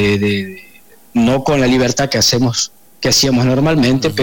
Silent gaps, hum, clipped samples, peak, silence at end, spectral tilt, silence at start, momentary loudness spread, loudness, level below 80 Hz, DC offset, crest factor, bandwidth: none; none; under 0.1%; -6 dBFS; 0 s; -4.5 dB/octave; 0 s; 9 LU; -14 LUFS; -38 dBFS; 0.5%; 8 dB; 17 kHz